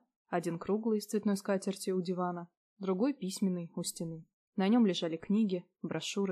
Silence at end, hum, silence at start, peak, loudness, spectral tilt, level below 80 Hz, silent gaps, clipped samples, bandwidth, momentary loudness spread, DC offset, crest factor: 0 s; none; 0.3 s; -18 dBFS; -34 LUFS; -5.5 dB/octave; -78 dBFS; 2.57-2.76 s, 4.33-4.53 s; under 0.1%; 14.5 kHz; 12 LU; under 0.1%; 16 dB